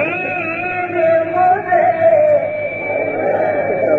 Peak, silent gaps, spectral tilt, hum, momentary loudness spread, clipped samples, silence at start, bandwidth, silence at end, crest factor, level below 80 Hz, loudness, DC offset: -2 dBFS; none; -8.5 dB/octave; none; 7 LU; under 0.1%; 0 s; 4.3 kHz; 0 s; 12 dB; -56 dBFS; -15 LUFS; under 0.1%